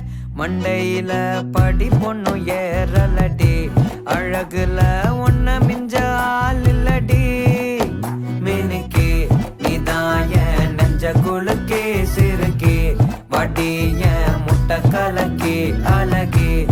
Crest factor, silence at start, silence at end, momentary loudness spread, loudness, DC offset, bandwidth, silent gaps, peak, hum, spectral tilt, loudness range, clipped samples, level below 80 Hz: 12 dB; 0 s; 0 s; 4 LU; -18 LUFS; under 0.1%; 17.5 kHz; none; -4 dBFS; none; -7 dB/octave; 1 LU; under 0.1%; -22 dBFS